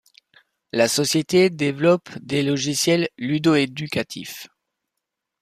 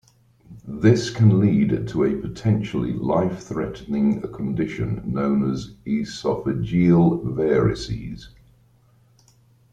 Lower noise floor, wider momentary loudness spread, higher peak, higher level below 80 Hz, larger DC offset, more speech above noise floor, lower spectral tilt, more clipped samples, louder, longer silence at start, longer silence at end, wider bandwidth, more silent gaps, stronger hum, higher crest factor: first, -82 dBFS vs -57 dBFS; about the same, 10 LU vs 11 LU; about the same, -4 dBFS vs -2 dBFS; second, -62 dBFS vs -46 dBFS; neither; first, 61 dB vs 36 dB; second, -4.5 dB/octave vs -8 dB/octave; neither; about the same, -21 LUFS vs -22 LUFS; first, 0.75 s vs 0.5 s; second, 0.95 s vs 1.45 s; first, 15 kHz vs 9 kHz; neither; neither; about the same, 18 dB vs 20 dB